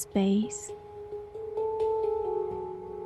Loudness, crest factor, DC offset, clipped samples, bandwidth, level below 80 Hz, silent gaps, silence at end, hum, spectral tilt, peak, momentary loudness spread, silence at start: -31 LUFS; 14 dB; under 0.1%; under 0.1%; 12.5 kHz; -58 dBFS; none; 0 s; none; -6 dB/octave; -16 dBFS; 15 LU; 0 s